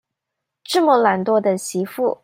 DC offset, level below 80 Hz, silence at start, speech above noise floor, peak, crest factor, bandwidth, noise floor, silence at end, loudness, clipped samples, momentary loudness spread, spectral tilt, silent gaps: under 0.1%; -70 dBFS; 0.7 s; 64 dB; -2 dBFS; 16 dB; 16 kHz; -81 dBFS; 0.1 s; -18 LUFS; under 0.1%; 8 LU; -4.5 dB/octave; none